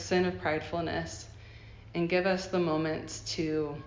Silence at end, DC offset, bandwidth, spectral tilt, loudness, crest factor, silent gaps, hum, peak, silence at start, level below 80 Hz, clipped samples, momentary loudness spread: 0 s; under 0.1%; 7.6 kHz; -5 dB/octave; -31 LUFS; 16 dB; none; none; -16 dBFS; 0 s; -54 dBFS; under 0.1%; 18 LU